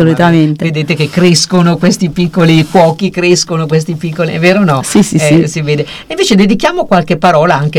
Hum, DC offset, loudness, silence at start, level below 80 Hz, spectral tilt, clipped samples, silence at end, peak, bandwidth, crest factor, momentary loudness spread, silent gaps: none; under 0.1%; -9 LUFS; 0 s; -40 dBFS; -5.5 dB/octave; 3%; 0 s; 0 dBFS; 15 kHz; 8 dB; 6 LU; none